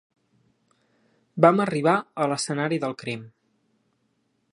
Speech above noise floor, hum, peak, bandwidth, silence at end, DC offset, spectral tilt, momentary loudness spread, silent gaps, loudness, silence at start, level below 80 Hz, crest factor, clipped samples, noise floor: 48 dB; none; -2 dBFS; 11.5 kHz; 1.25 s; under 0.1%; -5.5 dB/octave; 15 LU; none; -23 LUFS; 1.35 s; -74 dBFS; 24 dB; under 0.1%; -71 dBFS